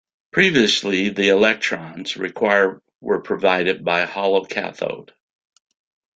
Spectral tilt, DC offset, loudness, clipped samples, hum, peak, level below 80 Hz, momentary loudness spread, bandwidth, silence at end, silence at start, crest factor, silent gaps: -4 dB/octave; under 0.1%; -19 LUFS; under 0.1%; none; -2 dBFS; -60 dBFS; 12 LU; 9.2 kHz; 1.15 s; 0.35 s; 18 dB; 2.95-2.99 s